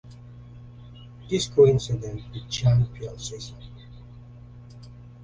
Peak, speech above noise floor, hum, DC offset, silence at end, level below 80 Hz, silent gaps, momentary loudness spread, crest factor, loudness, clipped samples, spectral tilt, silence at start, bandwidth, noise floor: -6 dBFS; 21 dB; 60 Hz at -35 dBFS; under 0.1%; 0 s; -46 dBFS; none; 27 LU; 20 dB; -24 LUFS; under 0.1%; -6 dB/octave; 0.05 s; 9.6 kHz; -45 dBFS